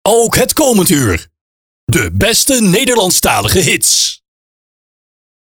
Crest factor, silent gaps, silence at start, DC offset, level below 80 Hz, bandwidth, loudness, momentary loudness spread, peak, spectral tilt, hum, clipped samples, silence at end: 12 dB; 1.41-1.87 s; 0.05 s; under 0.1%; -34 dBFS; over 20 kHz; -10 LUFS; 7 LU; 0 dBFS; -3 dB/octave; none; under 0.1%; 1.35 s